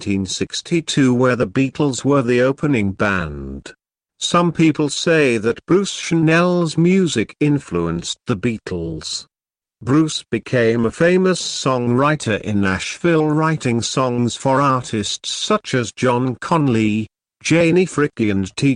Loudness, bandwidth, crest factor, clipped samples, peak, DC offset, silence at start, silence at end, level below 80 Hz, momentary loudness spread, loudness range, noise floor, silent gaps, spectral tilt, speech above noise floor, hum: -18 LUFS; 10.5 kHz; 14 dB; under 0.1%; -4 dBFS; under 0.1%; 0 s; 0 s; -48 dBFS; 8 LU; 3 LU; -58 dBFS; none; -5.5 dB/octave; 40 dB; none